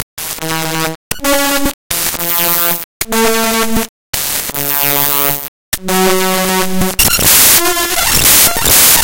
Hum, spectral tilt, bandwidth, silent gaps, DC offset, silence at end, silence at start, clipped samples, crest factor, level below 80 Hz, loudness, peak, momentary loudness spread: none; -1.5 dB/octave; over 20 kHz; 0.03-0.17 s, 0.95-1.11 s, 1.74-1.90 s, 2.84-3.00 s, 3.89-4.13 s, 5.48-5.72 s; under 0.1%; 0 s; 0 s; 0.5%; 12 dB; -32 dBFS; -10 LUFS; 0 dBFS; 12 LU